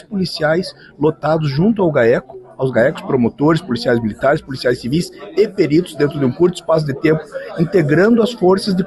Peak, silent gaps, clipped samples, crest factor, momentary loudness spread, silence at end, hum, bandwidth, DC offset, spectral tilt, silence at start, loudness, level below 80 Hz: -4 dBFS; none; under 0.1%; 12 dB; 7 LU; 0 s; none; 12.5 kHz; under 0.1%; -7 dB/octave; 0.1 s; -16 LUFS; -48 dBFS